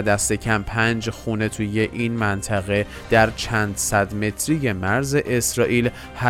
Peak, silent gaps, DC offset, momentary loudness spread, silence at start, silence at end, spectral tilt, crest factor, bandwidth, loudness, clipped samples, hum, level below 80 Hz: -2 dBFS; none; under 0.1%; 5 LU; 0 s; 0 s; -4.5 dB/octave; 18 dB; 16.5 kHz; -21 LUFS; under 0.1%; none; -40 dBFS